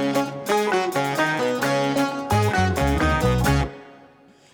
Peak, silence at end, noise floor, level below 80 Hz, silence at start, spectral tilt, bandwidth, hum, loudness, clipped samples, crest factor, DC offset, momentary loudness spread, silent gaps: -8 dBFS; 0.55 s; -52 dBFS; -34 dBFS; 0 s; -5.5 dB/octave; over 20 kHz; none; -22 LUFS; under 0.1%; 14 dB; under 0.1%; 4 LU; none